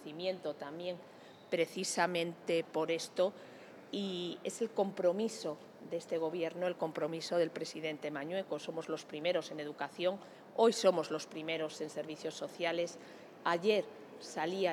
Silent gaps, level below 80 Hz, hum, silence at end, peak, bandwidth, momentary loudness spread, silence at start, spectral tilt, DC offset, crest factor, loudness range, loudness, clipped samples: none; under -90 dBFS; none; 0 s; -16 dBFS; 18 kHz; 12 LU; 0 s; -4 dB/octave; under 0.1%; 20 dB; 3 LU; -37 LUFS; under 0.1%